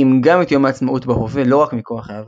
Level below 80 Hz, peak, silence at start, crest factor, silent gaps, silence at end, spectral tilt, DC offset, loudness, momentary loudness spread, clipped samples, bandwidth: -44 dBFS; 0 dBFS; 0 s; 14 dB; none; 0 s; -8 dB/octave; under 0.1%; -15 LUFS; 8 LU; under 0.1%; 7.6 kHz